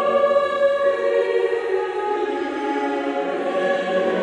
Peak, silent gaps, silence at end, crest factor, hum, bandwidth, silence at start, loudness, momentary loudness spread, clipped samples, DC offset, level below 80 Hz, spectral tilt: -6 dBFS; none; 0 s; 14 dB; none; 9.8 kHz; 0 s; -21 LUFS; 5 LU; under 0.1%; under 0.1%; -66 dBFS; -5 dB/octave